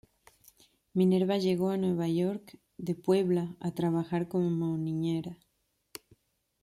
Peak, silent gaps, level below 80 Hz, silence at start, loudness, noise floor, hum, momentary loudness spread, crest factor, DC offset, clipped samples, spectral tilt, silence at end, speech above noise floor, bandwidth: -14 dBFS; none; -70 dBFS; 0.95 s; -30 LUFS; -77 dBFS; none; 15 LU; 16 dB; under 0.1%; under 0.1%; -8 dB/octave; 1.3 s; 48 dB; 14.5 kHz